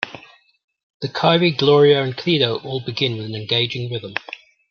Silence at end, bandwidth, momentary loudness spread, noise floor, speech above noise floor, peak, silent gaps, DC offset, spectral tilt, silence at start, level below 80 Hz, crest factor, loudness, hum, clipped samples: 0.35 s; 6.8 kHz; 15 LU; -43 dBFS; 25 dB; -2 dBFS; 0.64-0.68 s, 0.83-1.00 s; under 0.1%; -6.5 dB/octave; 0 s; -62 dBFS; 18 dB; -18 LUFS; none; under 0.1%